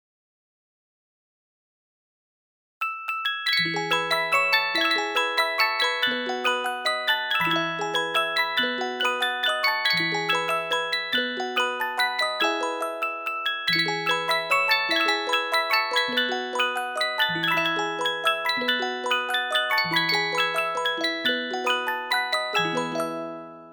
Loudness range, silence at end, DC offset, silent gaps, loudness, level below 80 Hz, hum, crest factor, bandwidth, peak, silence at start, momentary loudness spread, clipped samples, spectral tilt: 3 LU; 0 s; under 0.1%; none; -23 LUFS; -72 dBFS; none; 18 dB; 19 kHz; -8 dBFS; 2.8 s; 5 LU; under 0.1%; -2.5 dB/octave